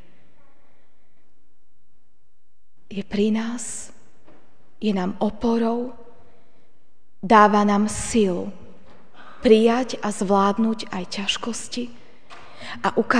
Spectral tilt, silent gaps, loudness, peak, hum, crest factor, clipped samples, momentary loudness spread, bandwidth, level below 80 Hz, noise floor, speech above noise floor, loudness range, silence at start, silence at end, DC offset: -5 dB/octave; none; -21 LUFS; 0 dBFS; none; 22 dB; under 0.1%; 19 LU; 10 kHz; -52 dBFS; -67 dBFS; 47 dB; 10 LU; 2.9 s; 0 s; 2%